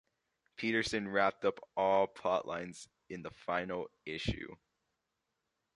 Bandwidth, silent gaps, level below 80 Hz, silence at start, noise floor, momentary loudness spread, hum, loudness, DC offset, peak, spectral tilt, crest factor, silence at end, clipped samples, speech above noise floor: 11.5 kHz; none; -60 dBFS; 0.6 s; -86 dBFS; 16 LU; none; -35 LUFS; under 0.1%; -16 dBFS; -5 dB/octave; 22 dB; 1.2 s; under 0.1%; 50 dB